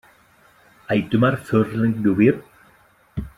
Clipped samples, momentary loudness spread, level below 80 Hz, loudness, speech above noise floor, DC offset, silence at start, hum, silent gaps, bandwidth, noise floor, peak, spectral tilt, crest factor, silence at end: under 0.1%; 14 LU; -46 dBFS; -20 LUFS; 37 dB; under 0.1%; 0.9 s; none; none; 13.5 kHz; -55 dBFS; -4 dBFS; -8.5 dB/octave; 18 dB; 0.1 s